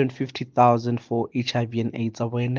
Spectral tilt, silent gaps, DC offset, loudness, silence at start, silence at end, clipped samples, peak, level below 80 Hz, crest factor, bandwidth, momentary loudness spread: -7 dB/octave; none; under 0.1%; -24 LUFS; 0 s; 0 s; under 0.1%; -4 dBFS; -66 dBFS; 20 dB; 7.2 kHz; 9 LU